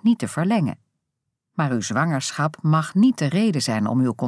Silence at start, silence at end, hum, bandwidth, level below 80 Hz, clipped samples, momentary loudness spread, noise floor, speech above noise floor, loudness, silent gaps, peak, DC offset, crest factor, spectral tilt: 0 s; 0 s; none; 11 kHz; -70 dBFS; under 0.1%; 7 LU; -80 dBFS; 59 dB; -21 LUFS; none; -6 dBFS; under 0.1%; 14 dB; -6 dB/octave